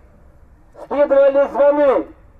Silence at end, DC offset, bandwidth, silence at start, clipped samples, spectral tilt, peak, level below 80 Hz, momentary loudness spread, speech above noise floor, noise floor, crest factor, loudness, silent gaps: 0.3 s; under 0.1%; 4.3 kHz; 0.8 s; under 0.1%; -7 dB/octave; -4 dBFS; -48 dBFS; 8 LU; 33 dB; -46 dBFS; 12 dB; -15 LUFS; none